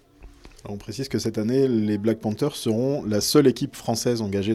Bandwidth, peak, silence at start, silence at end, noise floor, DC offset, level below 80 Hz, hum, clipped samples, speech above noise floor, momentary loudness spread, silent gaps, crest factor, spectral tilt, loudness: 16 kHz; -4 dBFS; 0.2 s; 0 s; -47 dBFS; under 0.1%; -54 dBFS; none; under 0.1%; 24 dB; 14 LU; none; 18 dB; -5.5 dB/octave; -23 LUFS